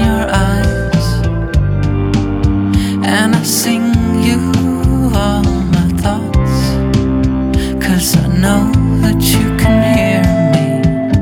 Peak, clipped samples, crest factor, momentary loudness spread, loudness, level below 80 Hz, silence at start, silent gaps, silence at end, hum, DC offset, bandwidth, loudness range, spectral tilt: 0 dBFS; under 0.1%; 12 dB; 3 LU; -13 LUFS; -20 dBFS; 0 s; none; 0 s; none; under 0.1%; 19 kHz; 2 LU; -6 dB/octave